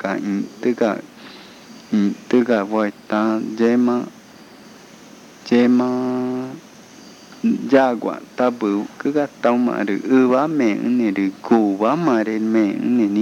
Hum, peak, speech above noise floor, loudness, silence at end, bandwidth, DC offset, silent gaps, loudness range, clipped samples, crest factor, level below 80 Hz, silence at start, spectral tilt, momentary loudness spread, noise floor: none; 0 dBFS; 25 dB; -19 LUFS; 0 s; 8.6 kHz; under 0.1%; none; 4 LU; under 0.1%; 18 dB; -70 dBFS; 0 s; -7 dB/octave; 9 LU; -43 dBFS